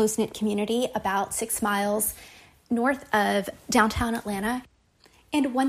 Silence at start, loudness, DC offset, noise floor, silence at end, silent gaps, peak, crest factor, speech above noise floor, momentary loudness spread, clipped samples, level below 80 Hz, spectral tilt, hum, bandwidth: 0 s; -26 LUFS; under 0.1%; -59 dBFS; 0 s; none; -6 dBFS; 20 dB; 34 dB; 6 LU; under 0.1%; -50 dBFS; -3.5 dB/octave; none; 15.5 kHz